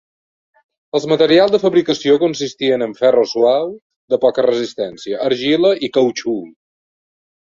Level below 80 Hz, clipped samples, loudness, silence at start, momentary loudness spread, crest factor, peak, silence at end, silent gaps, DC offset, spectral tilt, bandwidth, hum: -60 dBFS; under 0.1%; -16 LUFS; 0.95 s; 11 LU; 16 dB; -2 dBFS; 1 s; 3.82-3.90 s, 3.96-4.08 s; under 0.1%; -5 dB/octave; 7.6 kHz; none